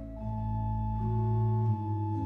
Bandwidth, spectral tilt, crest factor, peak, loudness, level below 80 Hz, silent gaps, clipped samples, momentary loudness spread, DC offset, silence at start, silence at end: 2.7 kHz; -12 dB/octave; 10 dB; -20 dBFS; -31 LUFS; -42 dBFS; none; under 0.1%; 6 LU; under 0.1%; 0 s; 0 s